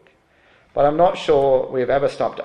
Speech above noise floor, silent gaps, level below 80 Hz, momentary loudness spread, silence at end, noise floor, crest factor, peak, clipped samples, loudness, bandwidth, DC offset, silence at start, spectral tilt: 38 dB; none; -46 dBFS; 5 LU; 0 s; -55 dBFS; 16 dB; -4 dBFS; under 0.1%; -18 LUFS; 9.8 kHz; under 0.1%; 0.75 s; -6.5 dB/octave